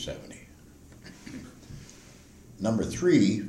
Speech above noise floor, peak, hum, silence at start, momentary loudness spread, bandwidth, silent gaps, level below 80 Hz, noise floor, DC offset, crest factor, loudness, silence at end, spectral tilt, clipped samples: 26 dB; -12 dBFS; none; 0 s; 26 LU; 14 kHz; none; -54 dBFS; -52 dBFS; under 0.1%; 18 dB; -26 LUFS; 0 s; -6 dB/octave; under 0.1%